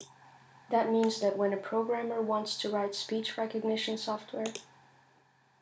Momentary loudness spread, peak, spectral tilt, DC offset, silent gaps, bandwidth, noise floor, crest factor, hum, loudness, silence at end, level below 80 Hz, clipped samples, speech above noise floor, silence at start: 9 LU; -16 dBFS; -4 dB/octave; under 0.1%; none; 8 kHz; -66 dBFS; 18 dB; none; -32 LUFS; 0.95 s; -84 dBFS; under 0.1%; 35 dB; 0 s